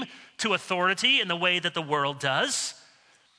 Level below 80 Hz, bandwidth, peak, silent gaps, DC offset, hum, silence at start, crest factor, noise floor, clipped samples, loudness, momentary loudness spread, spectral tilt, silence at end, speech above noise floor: -76 dBFS; 11 kHz; -10 dBFS; none; under 0.1%; none; 0 s; 18 dB; -60 dBFS; under 0.1%; -25 LUFS; 9 LU; -2 dB/octave; 0.65 s; 34 dB